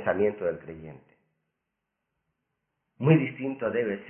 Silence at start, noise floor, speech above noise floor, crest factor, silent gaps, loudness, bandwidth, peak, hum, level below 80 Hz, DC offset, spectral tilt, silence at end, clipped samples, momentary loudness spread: 0 s; -83 dBFS; 56 dB; 24 dB; none; -27 LUFS; 3.3 kHz; -6 dBFS; none; -64 dBFS; under 0.1%; -12 dB/octave; 0 s; under 0.1%; 21 LU